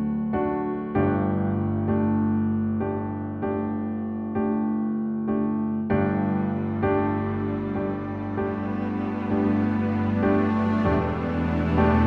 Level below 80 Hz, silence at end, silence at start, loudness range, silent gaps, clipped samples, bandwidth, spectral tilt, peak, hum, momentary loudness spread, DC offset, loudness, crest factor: -42 dBFS; 0 s; 0 s; 2 LU; none; under 0.1%; 4.7 kHz; -10.5 dB/octave; -8 dBFS; none; 6 LU; under 0.1%; -25 LUFS; 16 dB